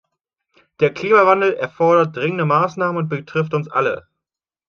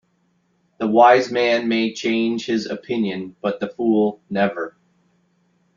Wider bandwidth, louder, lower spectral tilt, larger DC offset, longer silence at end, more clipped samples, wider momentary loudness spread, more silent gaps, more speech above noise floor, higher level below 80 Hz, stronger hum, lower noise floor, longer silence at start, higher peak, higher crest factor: about the same, 6.8 kHz vs 7.4 kHz; about the same, -17 LUFS vs -19 LUFS; first, -7.5 dB/octave vs -5.5 dB/octave; neither; second, 0.7 s vs 1.1 s; neither; second, 9 LU vs 13 LU; neither; first, 70 dB vs 46 dB; about the same, -64 dBFS vs -66 dBFS; neither; first, -87 dBFS vs -65 dBFS; about the same, 0.8 s vs 0.8 s; about the same, -2 dBFS vs -2 dBFS; about the same, 18 dB vs 18 dB